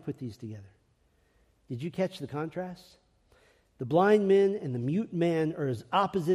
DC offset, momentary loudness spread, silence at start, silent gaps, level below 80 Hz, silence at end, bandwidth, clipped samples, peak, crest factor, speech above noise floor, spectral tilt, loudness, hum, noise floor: under 0.1%; 19 LU; 0.05 s; none; -68 dBFS; 0 s; 12.5 kHz; under 0.1%; -12 dBFS; 18 dB; 40 dB; -7.5 dB/octave; -29 LUFS; none; -68 dBFS